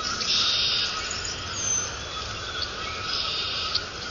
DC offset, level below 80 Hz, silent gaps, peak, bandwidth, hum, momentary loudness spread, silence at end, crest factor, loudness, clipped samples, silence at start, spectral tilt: under 0.1%; -46 dBFS; none; -10 dBFS; 7.4 kHz; none; 10 LU; 0 s; 18 dB; -25 LUFS; under 0.1%; 0 s; -0.5 dB/octave